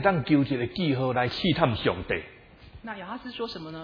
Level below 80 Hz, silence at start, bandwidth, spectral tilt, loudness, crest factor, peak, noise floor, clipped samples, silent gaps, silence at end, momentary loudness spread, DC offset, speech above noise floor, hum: -50 dBFS; 0 s; 5.4 kHz; -8 dB/octave; -27 LUFS; 22 dB; -4 dBFS; -49 dBFS; under 0.1%; none; 0 s; 14 LU; under 0.1%; 23 dB; none